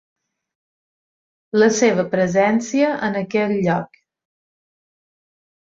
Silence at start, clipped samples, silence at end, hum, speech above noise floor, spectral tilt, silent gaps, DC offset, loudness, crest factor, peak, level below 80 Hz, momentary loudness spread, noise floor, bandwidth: 1.55 s; under 0.1%; 1.9 s; none; over 72 dB; -5.5 dB/octave; none; under 0.1%; -18 LUFS; 18 dB; -2 dBFS; -62 dBFS; 8 LU; under -90 dBFS; 8 kHz